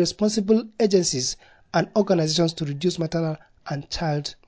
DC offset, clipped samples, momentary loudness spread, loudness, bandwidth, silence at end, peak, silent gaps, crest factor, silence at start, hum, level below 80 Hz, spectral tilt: under 0.1%; under 0.1%; 10 LU; -23 LUFS; 8 kHz; 0.15 s; -6 dBFS; none; 16 dB; 0 s; none; -52 dBFS; -5 dB/octave